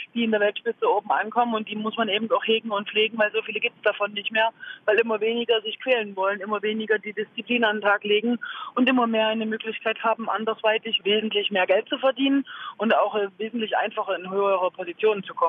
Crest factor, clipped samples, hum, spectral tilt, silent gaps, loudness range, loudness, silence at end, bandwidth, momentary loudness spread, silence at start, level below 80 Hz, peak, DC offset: 16 dB; under 0.1%; none; -7 dB/octave; none; 1 LU; -24 LUFS; 0 s; 4.1 kHz; 6 LU; 0 s; -82 dBFS; -8 dBFS; under 0.1%